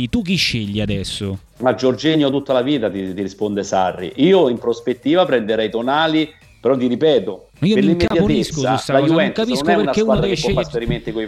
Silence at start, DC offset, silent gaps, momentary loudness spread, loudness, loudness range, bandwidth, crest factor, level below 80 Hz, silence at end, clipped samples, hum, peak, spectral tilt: 0 s; under 0.1%; none; 8 LU; -17 LUFS; 2 LU; 13.5 kHz; 16 dB; -40 dBFS; 0 s; under 0.1%; none; -2 dBFS; -5.5 dB/octave